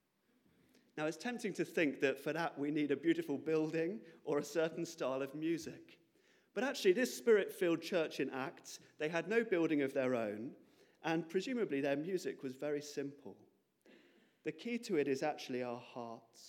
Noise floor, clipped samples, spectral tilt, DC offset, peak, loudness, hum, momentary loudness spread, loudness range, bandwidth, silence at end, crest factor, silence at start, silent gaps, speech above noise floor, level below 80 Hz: -76 dBFS; under 0.1%; -5 dB/octave; under 0.1%; -20 dBFS; -38 LUFS; none; 13 LU; 6 LU; 17 kHz; 0 s; 18 dB; 0.95 s; none; 38 dB; under -90 dBFS